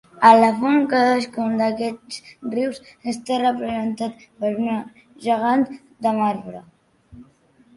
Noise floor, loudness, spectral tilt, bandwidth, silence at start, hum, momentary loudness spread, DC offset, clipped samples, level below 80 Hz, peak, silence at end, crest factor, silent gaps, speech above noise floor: -55 dBFS; -20 LUFS; -5.5 dB/octave; 11.5 kHz; 0.15 s; none; 16 LU; under 0.1%; under 0.1%; -62 dBFS; 0 dBFS; 0.55 s; 20 dB; none; 35 dB